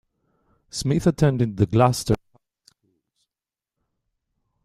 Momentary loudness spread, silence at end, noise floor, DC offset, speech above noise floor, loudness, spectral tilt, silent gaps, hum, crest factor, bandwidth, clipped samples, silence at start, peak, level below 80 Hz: 8 LU; 2.5 s; under -90 dBFS; under 0.1%; over 70 dB; -21 LUFS; -6.5 dB/octave; none; none; 22 dB; 14 kHz; under 0.1%; 0.75 s; -4 dBFS; -48 dBFS